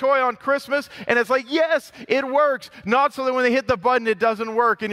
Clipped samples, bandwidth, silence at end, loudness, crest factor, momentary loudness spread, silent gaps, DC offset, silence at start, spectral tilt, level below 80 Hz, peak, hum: under 0.1%; 15 kHz; 0 s; -21 LUFS; 16 dB; 5 LU; none; under 0.1%; 0 s; -4.5 dB/octave; -58 dBFS; -4 dBFS; none